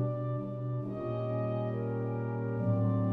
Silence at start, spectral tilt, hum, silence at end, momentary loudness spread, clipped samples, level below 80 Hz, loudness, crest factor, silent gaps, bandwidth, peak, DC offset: 0 s; -11.5 dB/octave; none; 0 s; 6 LU; under 0.1%; -62 dBFS; -34 LUFS; 12 dB; none; 3.7 kHz; -20 dBFS; under 0.1%